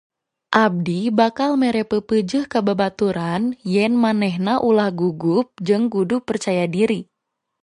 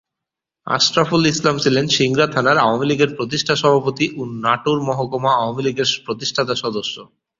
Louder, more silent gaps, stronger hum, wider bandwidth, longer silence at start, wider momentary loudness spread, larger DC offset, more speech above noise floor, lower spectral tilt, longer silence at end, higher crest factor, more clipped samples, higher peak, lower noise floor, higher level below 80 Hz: about the same, -19 LUFS vs -17 LUFS; neither; neither; first, 11 kHz vs 7.8 kHz; second, 0.5 s vs 0.65 s; about the same, 5 LU vs 7 LU; neither; second, 60 dB vs 66 dB; first, -6.5 dB/octave vs -4 dB/octave; first, 0.6 s vs 0.35 s; about the same, 18 dB vs 18 dB; neither; about the same, -2 dBFS vs 0 dBFS; second, -78 dBFS vs -84 dBFS; about the same, -58 dBFS vs -56 dBFS